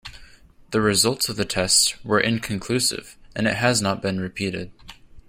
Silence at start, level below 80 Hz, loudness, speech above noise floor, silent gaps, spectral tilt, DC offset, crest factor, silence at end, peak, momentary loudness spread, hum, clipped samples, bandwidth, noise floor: 0.05 s; -50 dBFS; -21 LUFS; 26 dB; none; -3 dB/octave; under 0.1%; 20 dB; 0.1 s; -4 dBFS; 15 LU; none; under 0.1%; 16 kHz; -49 dBFS